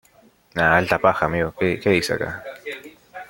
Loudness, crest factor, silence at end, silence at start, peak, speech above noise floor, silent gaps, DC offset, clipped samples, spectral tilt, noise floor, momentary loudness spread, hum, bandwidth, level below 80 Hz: -20 LUFS; 20 dB; 0.05 s; 0.55 s; -2 dBFS; 35 dB; none; under 0.1%; under 0.1%; -5.5 dB/octave; -55 dBFS; 17 LU; none; 17 kHz; -50 dBFS